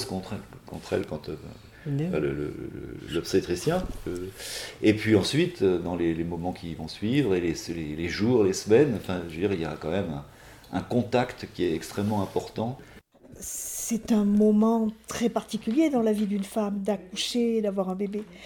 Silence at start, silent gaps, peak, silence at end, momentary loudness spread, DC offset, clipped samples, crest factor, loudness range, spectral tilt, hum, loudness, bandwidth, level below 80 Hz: 0 s; none; -6 dBFS; 0 s; 13 LU; under 0.1%; under 0.1%; 20 dB; 5 LU; -5.5 dB/octave; none; -27 LUFS; 18 kHz; -52 dBFS